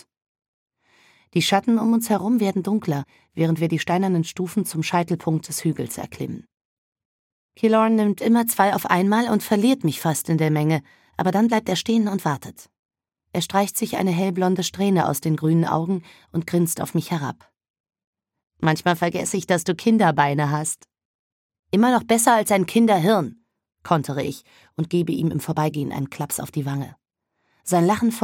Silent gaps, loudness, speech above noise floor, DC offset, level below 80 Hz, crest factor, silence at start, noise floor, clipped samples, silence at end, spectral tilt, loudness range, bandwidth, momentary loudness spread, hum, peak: 6.61-6.92 s, 7.05-7.49 s, 12.79-12.89 s, 17.70-17.74 s, 17.80-17.84 s, 18.04-18.13 s, 21.05-21.49 s, 21.59-21.63 s; -21 LUFS; 52 dB; under 0.1%; -64 dBFS; 20 dB; 1.35 s; -73 dBFS; under 0.1%; 0 s; -5.5 dB/octave; 5 LU; 17.5 kHz; 11 LU; none; -2 dBFS